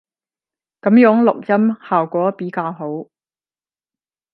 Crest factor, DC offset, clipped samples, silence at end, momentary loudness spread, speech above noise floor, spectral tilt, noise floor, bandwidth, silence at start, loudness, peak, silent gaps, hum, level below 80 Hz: 18 dB; under 0.1%; under 0.1%; 1.3 s; 15 LU; over 75 dB; -10.5 dB/octave; under -90 dBFS; 4.7 kHz; 0.85 s; -16 LUFS; 0 dBFS; none; none; -70 dBFS